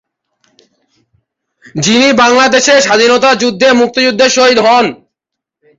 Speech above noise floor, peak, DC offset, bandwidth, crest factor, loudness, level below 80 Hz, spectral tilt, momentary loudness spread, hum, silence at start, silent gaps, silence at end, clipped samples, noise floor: 70 dB; 0 dBFS; under 0.1%; 8 kHz; 10 dB; -8 LUFS; -52 dBFS; -2.5 dB/octave; 4 LU; none; 1.75 s; none; 0.85 s; under 0.1%; -78 dBFS